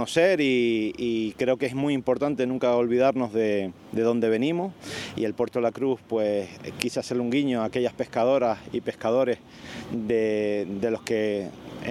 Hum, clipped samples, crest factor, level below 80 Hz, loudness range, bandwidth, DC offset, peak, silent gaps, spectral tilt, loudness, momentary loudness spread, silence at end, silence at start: none; under 0.1%; 24 dB; -62 dBFS; 3 LU; 14 kHz; under 0.1%; -2 dBFS; none; -5.5 dB/octave; -26 LUFS; 10 LU; 0 s; 0 s